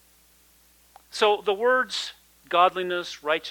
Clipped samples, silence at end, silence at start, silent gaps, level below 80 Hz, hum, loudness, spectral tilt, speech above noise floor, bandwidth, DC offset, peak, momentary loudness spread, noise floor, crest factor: under 0.1%; 0 s; 1.15 s; none; -66 dBFS; none; -24 LUFS; -2.5 dB/octave; 35 dB; 19 kHz; under 0.1%; -6 dBFS; 9 LU; -59 dBFS; 20 dB